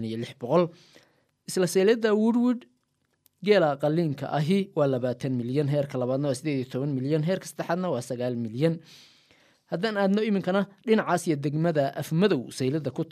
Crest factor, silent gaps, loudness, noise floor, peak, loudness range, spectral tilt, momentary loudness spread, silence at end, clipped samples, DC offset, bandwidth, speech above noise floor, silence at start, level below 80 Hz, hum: 18 dB; none; -26 LUFS; -74 dBFS; -8 dBFS; 4 LU; -6.5 dB/octave; 8 LU; 0.05 s; under 0.1%; under 0.1%; 15 kHz; 48 dB; 0 s; -72 dBFS; none